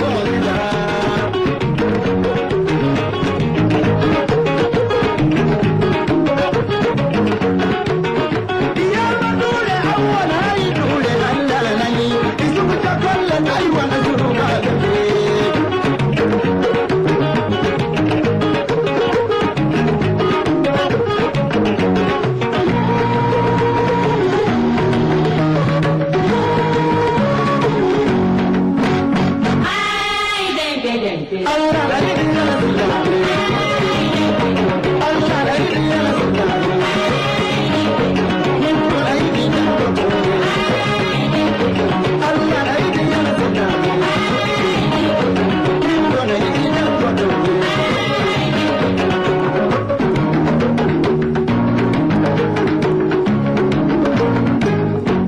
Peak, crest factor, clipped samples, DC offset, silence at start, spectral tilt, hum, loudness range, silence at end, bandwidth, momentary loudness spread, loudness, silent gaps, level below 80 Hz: -8 dBFS; 8 dB; under 0.1%; under 0.1%; 0 s; -6.5 dB/octave; none; 1 LU; 0 s; 12 kHz; 2 LU; -16 LUFS; none; -38 dBFS